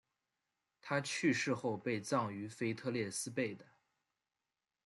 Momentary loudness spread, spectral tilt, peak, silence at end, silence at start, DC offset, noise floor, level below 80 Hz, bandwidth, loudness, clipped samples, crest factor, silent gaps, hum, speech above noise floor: 8 LU; -4.5 dB/octave; -22 dBFS; 1.25 s; 0.85 s; under 0.1%; under -90 dBFS; -82 dBFS; 12.5 kHz; -38 LUFS; under 0.1%; 18 dB; none; none; over 52 dB